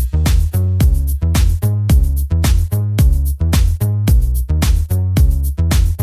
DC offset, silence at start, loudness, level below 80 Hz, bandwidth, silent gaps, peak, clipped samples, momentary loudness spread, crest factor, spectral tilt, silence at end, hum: under 0.1%; 0 s; -15 LUFS; -14 dBFS; 16 kHz; none; -2 dBFS; under 0.1%; 3 LU; 10 dB; -6 dB/octave; 0 s; none